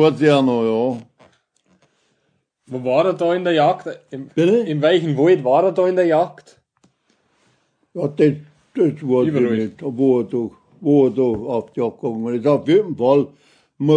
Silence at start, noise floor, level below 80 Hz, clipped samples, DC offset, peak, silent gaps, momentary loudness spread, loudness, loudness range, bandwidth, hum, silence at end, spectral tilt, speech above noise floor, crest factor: 0 s; -68 dBFS; -64 dBFS; under 0.1%; under 0.1%; -2 dBFS; none; 11 LU; -18 LUFS; 5 LU; 9.8 kHz; none; 0 s; -7.5 dB/octave; 51 dB; 16 dB